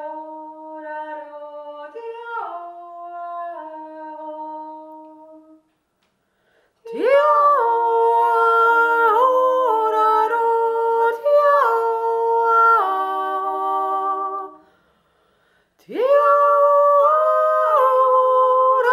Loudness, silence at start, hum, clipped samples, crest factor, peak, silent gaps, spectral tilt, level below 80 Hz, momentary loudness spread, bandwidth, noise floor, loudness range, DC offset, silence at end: -16 LUFS; 0 s; none; under 0.1%; 14 dB; -4 dBFS; none; -3.5 dB/octave; -76 dBFS; 21 LU; 14 kHz; -68 dBFS; 17 LU; under 0.1%; 0 s